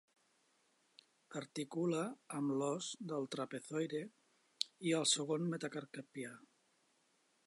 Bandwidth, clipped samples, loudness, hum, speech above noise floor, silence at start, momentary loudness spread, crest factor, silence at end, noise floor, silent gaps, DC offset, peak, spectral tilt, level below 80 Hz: 11.5 kHz; under 0.1%; -40 LUFS; none; 37 dB; 1.3 s; 14 LU; 28 dB; 1.05 s; -77 dBFS; none; under 0.1%; -16 dBFS; -4 dB/octave; under -90 dBFS